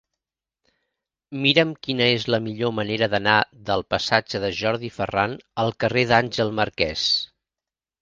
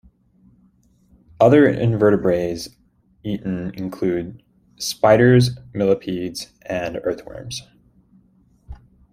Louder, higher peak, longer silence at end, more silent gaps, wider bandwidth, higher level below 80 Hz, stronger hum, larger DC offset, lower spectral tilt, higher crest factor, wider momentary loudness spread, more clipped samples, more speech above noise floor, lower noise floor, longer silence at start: second, -22 LUFS vs -19 LUFS; about the same, 0 dBFS vs -2 dBFS; first, 0.75 s vs 0.4 s; neither; second, 9.4 kHz vs 15.5 kHz; about the same, -52 dBFS vs -50 dBFS; neither; neither; second, -5 dB/octave vs -6.5 dB/octave; first, 24 dB vs 18 dB; second, 8 LU vs 18 LU; neither; first, 68 dB vs 39 dB; first, -90 dBFS vs -57 dBFS; about the same, 1.3 s vs 1.4 s